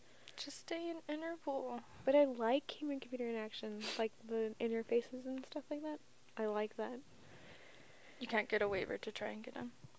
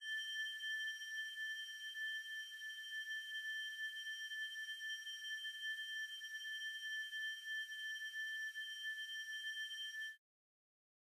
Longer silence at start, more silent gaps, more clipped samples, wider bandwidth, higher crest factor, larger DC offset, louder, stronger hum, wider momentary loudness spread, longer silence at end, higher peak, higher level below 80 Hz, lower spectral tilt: first, 0.25 s vs 0 s; neither; neither; second, 8 kHz vs 15.5 kHz; first, 20 dB vs 12 dB; neither; first, -40 LUFS vs -44 LUFS; neither; first, 18 LU vs 4 LU; second, 0.1 s vs 0.85 s; first, -20 dBFS vs -34 dBFS; first, -76 dBFS vs under -90 dBFS; first, -4.5 dB/octave vs 9 dB/octave